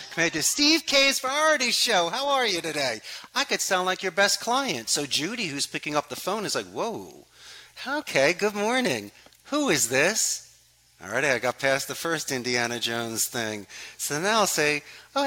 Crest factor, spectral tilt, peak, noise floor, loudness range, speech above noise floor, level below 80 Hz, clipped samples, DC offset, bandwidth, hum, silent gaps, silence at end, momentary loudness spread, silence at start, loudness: 20 dB; -2 dB/octave; -6 dBFS; -58 dBFS; 5 LU; 33 dB; -66 dBFS; under 0.1%; under 0.1%; 17 kHz; none; none; 0 s; 11 LU; 0 s; -24 LUFS